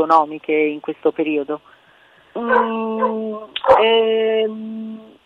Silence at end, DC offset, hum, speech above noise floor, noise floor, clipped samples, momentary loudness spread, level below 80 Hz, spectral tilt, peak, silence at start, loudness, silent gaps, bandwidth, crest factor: 0.2 s; under 0.1%; none; 33 dB; -51 dBFS; under 0.1%; 15 LU; -58 dBFS; -6 dB/octave; -2 dBFS; 0 s; -18 LUFS; none; 5.6 kHz; 16 dB